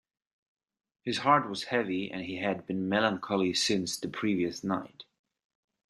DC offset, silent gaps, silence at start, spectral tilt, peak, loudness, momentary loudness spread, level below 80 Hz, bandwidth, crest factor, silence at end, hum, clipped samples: under 0.1%; none; 1.05 s; -4 dB/octave; -8 dBFS; -30 LUFS; 9 LU; -72 dBFS; 12.5 kHz; 24 dB; 0.85 s; none; under 0.1%